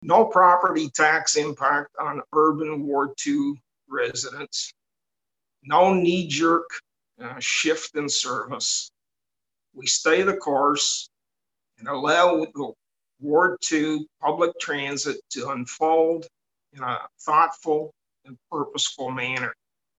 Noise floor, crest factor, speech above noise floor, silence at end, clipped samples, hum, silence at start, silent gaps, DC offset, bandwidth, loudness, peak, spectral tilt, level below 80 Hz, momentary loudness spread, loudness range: -89 dBFS; 20 dB; 66 dB; 0.45 s; under 0.1%; none; 0 s; none; under 0.1%; 9.2 kHz; -23 LUFS; -4 dBFS; -3 dB/octave; -70 dBFS; 13 LU; 3 LU